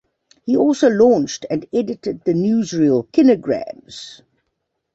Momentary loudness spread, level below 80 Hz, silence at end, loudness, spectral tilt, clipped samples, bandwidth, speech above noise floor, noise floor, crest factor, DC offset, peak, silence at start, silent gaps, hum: 18 LU; -58 dBFS; 0.8 s; -17 LUFS; -6 dB/octave; under 0.1%; 8 kHz; 57 dB; -74 dBFS; 16 dB; under 0.1%; -2 dBFS; 0.45 s; none; none